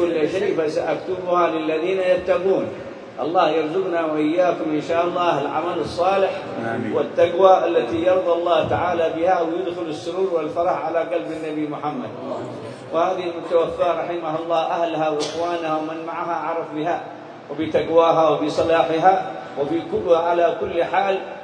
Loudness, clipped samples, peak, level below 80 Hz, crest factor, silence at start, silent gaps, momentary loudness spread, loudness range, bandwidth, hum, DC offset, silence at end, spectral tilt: -21 LUFS; under 0.1%; -2 dBFS; -58 dBFS; 20 dB; 0 s; none; 10 LU; 5 LU; 10 kHz; none; under 0.1%; 0 s; -6 dB/octave